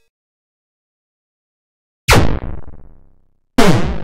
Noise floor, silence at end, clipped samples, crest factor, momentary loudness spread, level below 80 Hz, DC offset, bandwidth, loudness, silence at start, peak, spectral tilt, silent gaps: -52 dBFS; 0 s; under 0.1%; 16 dB; 17 LU; -26 dBFS; under 0.1%; 16 kHz; -15 LUFS; 2.1 s; 0 dBFS; -5 dB/octave; none